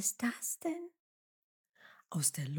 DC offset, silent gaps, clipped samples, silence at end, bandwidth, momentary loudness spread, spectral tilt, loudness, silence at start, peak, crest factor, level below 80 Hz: under 0.1%; 1.00-1.64 s; under 0.1%; 0 s; 19 kHz; 11 LU; -3.5 dB/octave; -36 LUFS; 0 s; -16 dBFS; 22 dB; under -90 dBFS